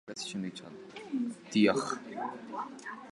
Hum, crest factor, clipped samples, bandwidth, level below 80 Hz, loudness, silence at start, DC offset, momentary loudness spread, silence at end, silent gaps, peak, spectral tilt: none; 22 dB; under 0.1%; 11.5 kHz; -76 dBFS; -34 LUFS; 0.05 s; under 0.1%; 18 LU; 0 s; none; -12 dBFS; -4.5 dB/octave